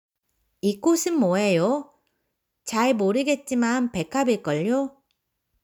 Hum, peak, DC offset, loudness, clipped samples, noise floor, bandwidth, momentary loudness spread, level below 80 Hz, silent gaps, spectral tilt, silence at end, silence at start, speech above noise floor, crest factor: none; -10 dBFS; under 0.1%; -23 LUFS; under 0.1%; -77 dBFS; over 20 kHz; 7 LU; -64 dBFS; none; -5 dB/octave; 0.75 s; 0.65 s; 55 dB; 14 dB